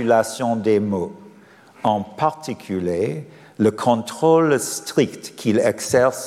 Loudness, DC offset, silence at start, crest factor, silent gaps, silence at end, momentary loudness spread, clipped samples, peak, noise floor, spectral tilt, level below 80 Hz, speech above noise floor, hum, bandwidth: -20 LUFS; under 0.1%; 0 s; 16 dB; none; 0 s; 9 LU; under 0.1%; -4 dBFS; -48 dBFS; -5 dB/octave; -58 dBFS; 28 dB; none; 15.5 kHz